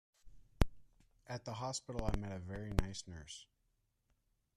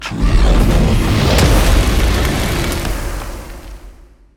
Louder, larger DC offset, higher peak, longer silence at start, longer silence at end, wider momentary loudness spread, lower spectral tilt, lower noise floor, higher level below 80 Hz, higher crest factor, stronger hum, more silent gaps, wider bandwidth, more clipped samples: second, -43 LUFS vs -15 LUFS; neither; second, -12 dBFS vs 0 dBFS; first, 0.25 s vs 0 s; first, 1.15 s vs 0.45 s; second, 11 LU vs 16 LU; about the same, -5 dB/octave vs -5 dB/octave; first, -81 dBFS vs -40 dBFS; second, -46 dBFS vs -16 dBFS; first, 30 dB vs 14 dB; neither; neither; second, 13.5 kHz vs 17 kHz; neither